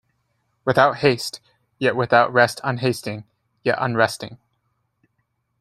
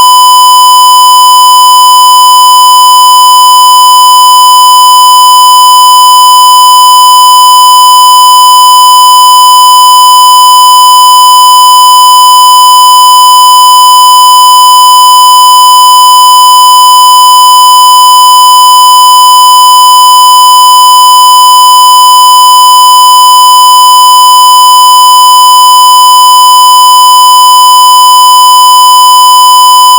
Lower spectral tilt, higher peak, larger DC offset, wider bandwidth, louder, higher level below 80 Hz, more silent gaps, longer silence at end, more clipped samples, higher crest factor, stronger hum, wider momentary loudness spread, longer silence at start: first, -5 dB/octave vs 4 dB/octave; about the same, 0 dBFS vs 0 dBFS; second, under 0.1% vs 0.2%; second, 15.5 kHz vs over 20 kHz; second, -20 LUFS vs 1 LUFS; first, -60 dBFS vs -82 dBFS; neither; first, 1.25 s vs 0 s; second, under 0.1% vs 80%; first, 22 dB vs 0 dB; neither; first, 16 LU vs 0 LU; first, 0.65 s vs 0 s